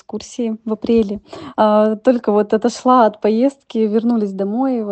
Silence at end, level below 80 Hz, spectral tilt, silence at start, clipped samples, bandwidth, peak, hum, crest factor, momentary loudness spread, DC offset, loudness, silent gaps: 0 s; -54 dBFS; -6.5 dB/octave; 0.15 s; under 0.1%; 8.6 kHz; 0 dBFS; none; 16 dB; 10 LU; under 0.1%; -16 LUFS; none